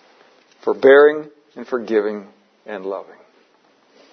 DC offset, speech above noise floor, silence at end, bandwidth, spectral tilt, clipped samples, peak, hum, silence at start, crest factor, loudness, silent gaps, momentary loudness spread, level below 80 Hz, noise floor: under 0.1%; 40 dB; 1.1 s; 6.2 kHz; -6 dB/octave; under 0.1%; 0 dBFS; none; 0.65 s; 18 dB; -17 LUFS; none; 23 LU; -76 dBFS; -57 dBFS